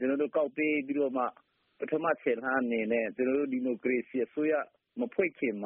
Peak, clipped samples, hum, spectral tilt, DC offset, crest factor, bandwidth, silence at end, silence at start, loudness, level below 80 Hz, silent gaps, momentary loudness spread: -14 dBFS; under 0.1%; none; -4.5 dB/octave; under 0.1%; 18 dB; 3.6 kHz; 0 s; 0 s; -31 LUFS; -76 dBFS; none; 5 LU